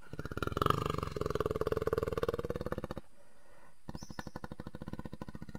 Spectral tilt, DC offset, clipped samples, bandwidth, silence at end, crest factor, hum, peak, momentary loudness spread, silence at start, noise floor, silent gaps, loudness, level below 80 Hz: -6.5 dB/octave; 0.4%; under 0.1%; 16 kHz; 0 s; 26 dB; none; -12 dBFS; 15 LU; 0 s; -64 dBFS; none; -38 LUFS; -50 dBFS